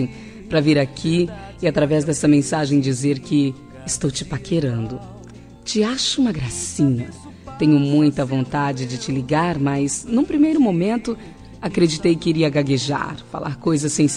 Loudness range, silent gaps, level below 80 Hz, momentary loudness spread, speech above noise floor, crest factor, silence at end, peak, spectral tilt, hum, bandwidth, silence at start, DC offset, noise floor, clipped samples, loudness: 3 LU; none; -46 dBFS; 12 LU; 21 dB; 16 dB; 0 s; -4 dBFS; -5.5 dB/octave; none; 10.5 kHz; 0 s; under 0.1%; -40 dBFS; under 0.1%; -20 LUFS